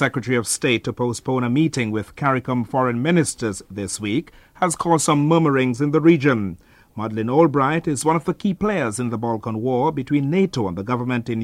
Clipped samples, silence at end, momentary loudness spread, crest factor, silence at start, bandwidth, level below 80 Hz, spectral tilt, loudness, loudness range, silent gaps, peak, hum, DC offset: under 0.1%; 0 s; 8 LU; 18 dB; 0 s; 15 kHz; -52 dBFS; -5.5 dB/octave; -20 LUFS; 3 LU; none; -2 dBFS; none; under 0.1%